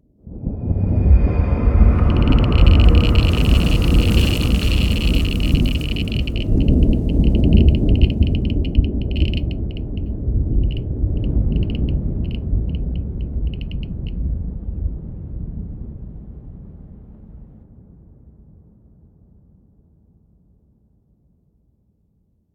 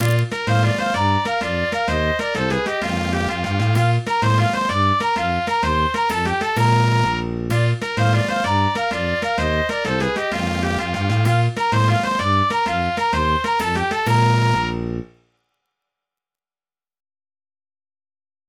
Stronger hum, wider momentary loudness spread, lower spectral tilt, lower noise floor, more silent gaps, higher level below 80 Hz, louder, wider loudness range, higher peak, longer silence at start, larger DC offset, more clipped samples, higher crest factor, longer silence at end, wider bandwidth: neither; first, 16 LU vs 4 LU; first, -7.5 dB/octave vs -5.5 dB/octave; second, -63 dBFS vs under -90 dBFS; neither; first, -20 dBFS vs -38 dBFS; about the same, -19 LUFS vs -19 LUFS; first, 15 LU vs 3 LU; first, 0 dBFS vs -4 dBFS; first, 0.25 s vs 0 s; neither; neither; about the same, 18 dB vs 16 dB; first, 5.1 s vs 3.45 s; about the same, 15 kHz vs 16 kHz